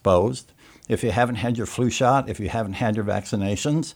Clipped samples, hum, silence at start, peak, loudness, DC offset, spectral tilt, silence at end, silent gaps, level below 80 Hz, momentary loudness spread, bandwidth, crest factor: under 0.1%; none; 0.05 s; -6 dBFS; -23 LUFS; under 0.1%; -5.5 dB/octave; 0.05 s; none; -48 dBFS; 7 LU; 17 kHz; 18 dB